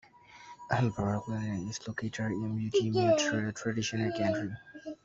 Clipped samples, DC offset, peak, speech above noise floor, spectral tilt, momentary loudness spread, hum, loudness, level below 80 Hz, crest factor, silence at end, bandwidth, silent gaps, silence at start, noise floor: under 0.1%; under 0.1%; -12 dBFS; 22 dB; -5.5 dB/octave; 12 LU; none; -32 LUFS; -62 dBFS; 20 dB; 0.1 s; 7.8 kHz; none; 0.3 s; -53 dBFS